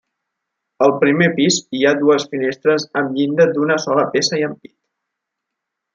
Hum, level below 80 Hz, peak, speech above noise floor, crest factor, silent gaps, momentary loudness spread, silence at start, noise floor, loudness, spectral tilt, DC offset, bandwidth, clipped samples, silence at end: none; -66 dBFS; -2 dBFS; 64 dB; 16 dB; none; 5 LU; 0.8 s; -80 dBFS; -16 LUFS; -4.5 dB/octave; under 0.1%; 9.2 kHz; under 0.1%; 1.4 s